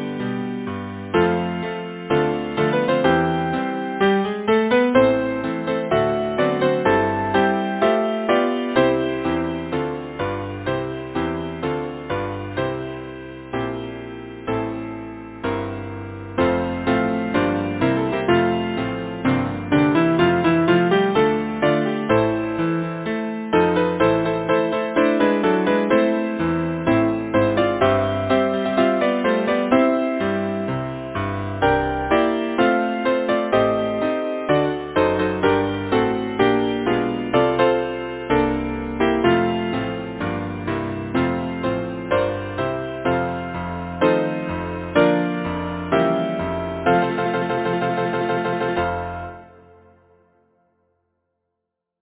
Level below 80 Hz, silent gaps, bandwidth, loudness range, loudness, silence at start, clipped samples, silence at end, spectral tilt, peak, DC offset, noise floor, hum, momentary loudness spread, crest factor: -44 dBFS; none; 4 kHz; 7 LU; -21 LUFS; 0 s; under 0.1%; 2.55 s; -10.5 dB/octave; -2 dBFS; under 0.1%; -80 dBFS; none; 9 LU; 18 dB